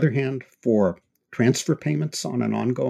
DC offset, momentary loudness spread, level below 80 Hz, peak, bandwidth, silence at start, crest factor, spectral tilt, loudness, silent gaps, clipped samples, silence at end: under 0.1%; 7 LU; -64 dBFS; -6 dBFS; 15 kHz; 0 s; 18 dB; -6 dB/octave; -24 LUFS; none; under 0.1%; 0 s